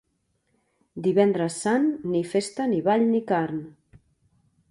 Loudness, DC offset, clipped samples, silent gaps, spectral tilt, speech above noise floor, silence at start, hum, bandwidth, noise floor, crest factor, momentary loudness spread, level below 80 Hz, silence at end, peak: -24 LUFS; under 0.1%; under 0.1%; none; -6 dB/octave; 49 dB; 0.95 s; none; 11.5 kHz; -72 dBFS; 18 dB; 8 LU; -66 dBFS; 1 s; -8 dBFS